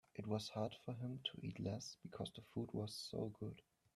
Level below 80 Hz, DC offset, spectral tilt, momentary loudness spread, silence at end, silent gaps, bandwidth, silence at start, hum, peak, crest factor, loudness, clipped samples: -76 dBFS; under 0.1%; -5.5 dB/octave; 7 LU; 0.35 s; none; 13.5 kHz; 0.15 s; none; -28 dBFS; 20 dB; -47 LUFS; under 0.1%